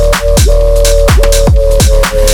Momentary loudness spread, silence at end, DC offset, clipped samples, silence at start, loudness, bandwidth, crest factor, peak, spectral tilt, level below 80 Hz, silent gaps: 1 LU; 0 s; under 0.1%; under 0.1%; 0 s; -8 LUFS; 18 kHz; 6 dB; 0 dBFS; -4.5 dB/octave; -8 dBFS; none